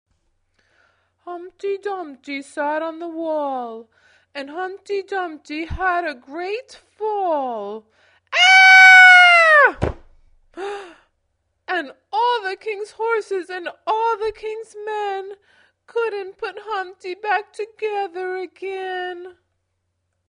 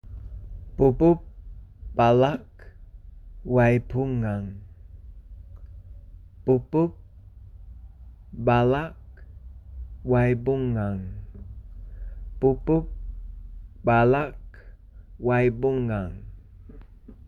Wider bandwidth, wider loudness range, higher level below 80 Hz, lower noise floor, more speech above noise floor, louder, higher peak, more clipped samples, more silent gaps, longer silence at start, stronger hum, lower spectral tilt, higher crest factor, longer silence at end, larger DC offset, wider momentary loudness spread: first, 10.5 kHz vs 6.4 kHz; first, 17 LU vs 5 LU; second, -48 dBFS vs -40 dBFS; first, -73 dBFS vs -46 dBFS; first, 52 dB vs 24 dB; first, -15 LUFS vs -24 LUFS; first, 0 dBFS vs -8 dBFS; neither; neither; first, 1.25 s vs 0.05 s; neither; second, -2.5 dB/octave vs -9.5 dB/octave; about the same, 20 dB vs 18 dB; first, 1 s vs 0.15 s; neither; second, 22 LU vs 25 LU